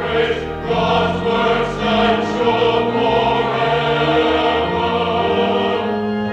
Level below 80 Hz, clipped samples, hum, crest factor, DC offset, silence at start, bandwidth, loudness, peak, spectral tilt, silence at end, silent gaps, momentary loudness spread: -38 dBFS; under 0.1%; none; 12 dB; under 0.1%; 0 s; 8.4 kHz; -17 LUFS; -4 dBFS; -6 dB/octave; 0 s; none; 4 LU